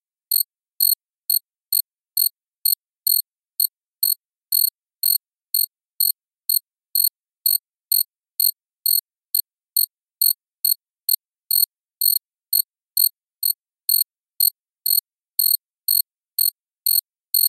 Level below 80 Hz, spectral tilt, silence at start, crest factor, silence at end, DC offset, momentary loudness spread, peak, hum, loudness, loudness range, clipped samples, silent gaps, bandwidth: under -90 dBFS; 11 dB/octave; 0.3 s; 22 dB; 0 s; under 0.1%; 5 LU; -2 dBFS; none; -20 LUFS; 1 LU; under 0.1%; 2.48-2.52 s, 2.58-2.62 s, 5.85-5.90 s, 6.67-6.71 s, 11.25-11.32 s, 11.67-11.71 s, 15.78-15.82 s; 15 kHz